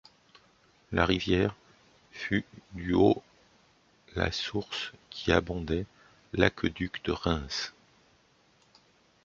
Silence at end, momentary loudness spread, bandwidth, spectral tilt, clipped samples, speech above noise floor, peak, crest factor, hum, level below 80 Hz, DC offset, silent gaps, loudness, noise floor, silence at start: 1.55 s; 14 LU; 7.6 kHz; -5.5 dB/octave; under 0.1%; 36 dB; -4 dBFS; 28 dB; none; -48 dBFS; under 0.1%; none; -30 LUFS; -65 dBFS; 0.9 s